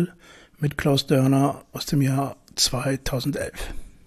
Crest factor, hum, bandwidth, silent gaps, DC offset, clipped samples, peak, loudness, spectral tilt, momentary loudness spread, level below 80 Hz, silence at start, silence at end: 18 dB; none; 14 kHz; none; under 0.1%; under 0.1%; -6 dBFS; -23 LUFS; -5 dB/octave; 11 LU; -42 dBFS; 0 s; 0.2 s